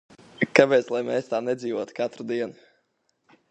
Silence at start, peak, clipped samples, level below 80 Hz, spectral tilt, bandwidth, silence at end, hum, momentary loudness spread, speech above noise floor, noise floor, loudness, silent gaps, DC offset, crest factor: 0.4 s; 0 dBFS; under 0.1%; -74 dBFS; -5.5 dB/octave; 9 kHz; 1 s; none; 12 LU; 48 dB; -72 dBFS; -24 LUFS; none; under 0.1%; 26 dB